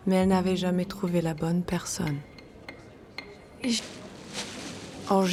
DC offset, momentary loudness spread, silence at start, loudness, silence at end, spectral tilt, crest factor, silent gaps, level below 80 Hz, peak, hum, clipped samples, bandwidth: under 0.1%; 21 LU; 0 s; -29 LUFS; 0 s; -5.5 dB/octave; 18 dB; none; -54 dBFS; -10 dBFS; none; under 0.1%; 15 kHz